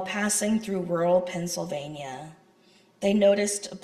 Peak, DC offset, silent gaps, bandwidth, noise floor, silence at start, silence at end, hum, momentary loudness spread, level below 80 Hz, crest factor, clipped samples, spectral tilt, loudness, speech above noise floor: -10 dBFS; under 0.1%; none; 14 kHz; -59 dBFS; 0 s; 0.05 s; none; 15 LU; -64 dBFS; 16 dB; under 0.1%; -4 dB/octave; -25 LUFS; 33 dB